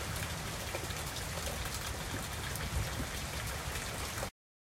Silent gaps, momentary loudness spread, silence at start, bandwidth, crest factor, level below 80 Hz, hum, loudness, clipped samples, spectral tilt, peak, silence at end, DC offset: none; 2 LU; 0 s; 16.5 kHz; 18 dB; -46 dBFS; none; -38 LUFS; under 0.1%; -3 dB/octave; -22 dBFS; 0.45 s; under 0.1%